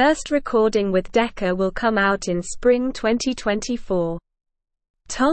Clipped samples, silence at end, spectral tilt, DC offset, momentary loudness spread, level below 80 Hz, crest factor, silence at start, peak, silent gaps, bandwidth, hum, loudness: under 0.1%; 0 s; -4.5 dB/octave; under 0.1%; 6 LU; -42 dBFS; 14 dB; 0 s; -6 dBFS; 4.90-4.94 s; 8.8 kHz; none; -21 LUFS